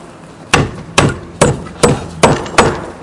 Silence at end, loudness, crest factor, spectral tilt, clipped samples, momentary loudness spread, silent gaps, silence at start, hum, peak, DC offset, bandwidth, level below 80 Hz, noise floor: 0 s; -13 LUFS; 14 dB; -4.5 dB/octave; 0.3%; 3 LU; none; 0 s; none; 0 dBFS; under 0.1%; 12 kHz; -32 dBFS; -34 dBFS